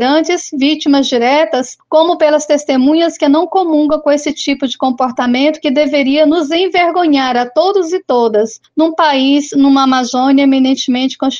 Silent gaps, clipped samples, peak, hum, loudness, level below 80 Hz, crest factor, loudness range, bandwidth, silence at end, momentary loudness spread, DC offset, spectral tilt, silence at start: none; under 0.1%; 0 dBFS; none; -12 LUFS; -56 dBFS; 12 dB; 1 LU; 7.6 kHz; 0 s; 5 LU; under 0.1%; -3 dB/octave; 0 s